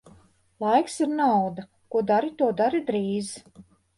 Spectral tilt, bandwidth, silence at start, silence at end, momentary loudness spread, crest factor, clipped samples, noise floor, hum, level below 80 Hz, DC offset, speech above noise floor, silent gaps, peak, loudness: -5.5 dB/octave; 11.5 kHz; 0.6 s; 0.35 s; 9 LU; 18 dB; under 0.1%; -57 dBFS; none; -66 dBFS; under 0.1%; 33 dB; none; -8 dBFS; -25 LUFS